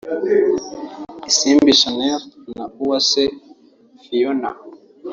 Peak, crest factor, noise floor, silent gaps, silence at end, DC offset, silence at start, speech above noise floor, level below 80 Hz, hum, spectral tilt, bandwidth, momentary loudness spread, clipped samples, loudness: -2 dBFS; 18 dB; -50 dBFS; none; 0 s; under 0.1%; 0.05 s; 33 dB; -56 dBFS; none; -2 dB/octave; 7.6 kHz; 20 LU; under 0.1%; -16 LUFS